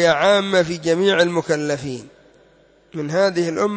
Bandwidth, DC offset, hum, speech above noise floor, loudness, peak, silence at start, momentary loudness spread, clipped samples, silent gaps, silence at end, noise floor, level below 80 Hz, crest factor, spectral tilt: 8 kHz; under 0.1%; none; 35 dB; -18 LUFS; -4 dBFS; 0 s; 15 LU; under 0.1%; none; 0 s; -53 dBFS; -58 dBFS; 14 dB; -4.5 dB/octave